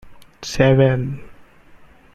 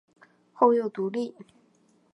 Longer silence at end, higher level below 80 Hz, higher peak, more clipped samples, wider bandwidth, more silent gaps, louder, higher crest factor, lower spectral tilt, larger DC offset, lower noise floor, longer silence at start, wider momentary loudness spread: second, 0.4 s vs 0.85 s; first, -42 dBFS vs -84 dBFS; first, 0 dBFS vs -6 dBFS; neither; first, 12 kHz vs 8.2 kHz; neither; first, -17 LUFS vs -26 LUFS; about the same, 20 dB vs 22 dB; about the same, -6.5 dB/octave vs -7.5 dB/octave; neither; second, -46 dBFS vs -64 dBFS; second, 0.05 s vs 0.6 s; first, 20 LU vs 12 LU